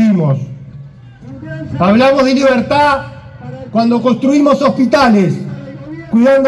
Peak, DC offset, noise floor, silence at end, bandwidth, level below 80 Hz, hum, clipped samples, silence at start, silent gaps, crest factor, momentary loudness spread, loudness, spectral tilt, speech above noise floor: 0 dBFS; under 0.1%; -34 dBFS; 0 s; 11.5 kHz; -44 dBFS; none; under 0.1%; 0 s; none; 12 dB; 21 LU; -11 LUFS; -7 dB/octave; 24 dB